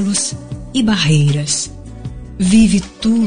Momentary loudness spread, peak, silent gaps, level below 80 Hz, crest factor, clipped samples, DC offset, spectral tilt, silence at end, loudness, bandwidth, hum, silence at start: 19 LU; 0 dBFS; none; -36 dBFS; 14 dB; under 0.1%; under 0.1%; -4.5 dB/octave; 0 s; -14 LUFS; 10 kHz; none; 0 s